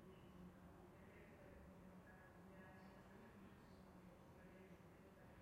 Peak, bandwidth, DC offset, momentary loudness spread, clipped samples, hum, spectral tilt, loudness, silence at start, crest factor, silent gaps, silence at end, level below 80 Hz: -50 dBFS; 15.5 kHz; under 0.1%; 2 LU; under 0.1%; none; -6.5 dB/octave; -64 LUFS; 0 s; 14 dB; none; 0 s; -74 dBFS